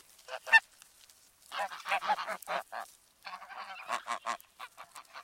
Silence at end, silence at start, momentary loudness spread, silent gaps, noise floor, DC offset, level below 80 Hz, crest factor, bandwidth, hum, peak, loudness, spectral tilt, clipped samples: 0 s; 0.3 s; 24 LU; none; -61 dBFS; under 0.1%; -82 dBFS; 28 dB; 16.5 kHz; none; -10 dBFS; -32 LUFS; 0 dB/octave; under 0.1%